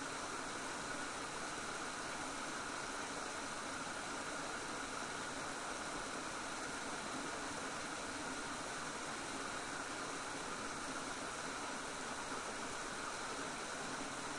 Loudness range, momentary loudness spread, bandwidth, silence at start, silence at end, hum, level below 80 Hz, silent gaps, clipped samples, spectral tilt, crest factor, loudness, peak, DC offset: 0 LU; 0 LU; 11.5 kHz; 0 s; 0 s; none; -66 dBFS; none; under 0.1%; -2 dB/octave; 14 dB; -43 LUFS; -30 dBFS; under 0.1%